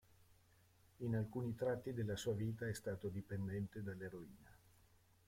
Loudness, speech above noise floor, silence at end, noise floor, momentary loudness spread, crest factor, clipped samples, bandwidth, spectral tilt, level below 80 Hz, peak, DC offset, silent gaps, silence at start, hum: -45 LUFS; 28 dB; 0.75 s; -72 dBFS; 8 LU; 16 dB; under 0.1%; 16.5 kHz; -6.5 dB/octave; -70 dBFS; -28 dBFS; under 0.1%; none; 0.2 s; none